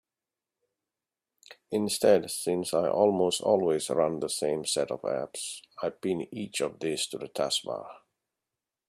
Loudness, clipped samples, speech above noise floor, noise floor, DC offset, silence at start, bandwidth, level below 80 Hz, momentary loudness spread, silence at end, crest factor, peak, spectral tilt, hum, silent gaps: -29 LUFS; under 0.1%; over 62 dB; under -90 dBFS; under 0.1%; 1.5 s; 15.5 kHz; -70 dBFS; 11 LU; 0.9 s; 22 dB; -8 dBFS; -3.5 dB/octave; none; none